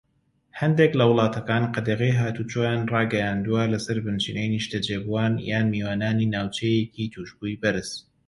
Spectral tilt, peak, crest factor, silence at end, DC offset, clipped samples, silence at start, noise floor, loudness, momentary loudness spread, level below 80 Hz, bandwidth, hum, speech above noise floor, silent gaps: -6.5 dB/octave; -4 dBFS; 20 dB; 0.25 s; under 0.1%; under 0.1%; 0.55 s; -65 dBFS; -24 LUFS; 9 LU; -54 dBFS; 11.5 kHz; none; 42 dB; none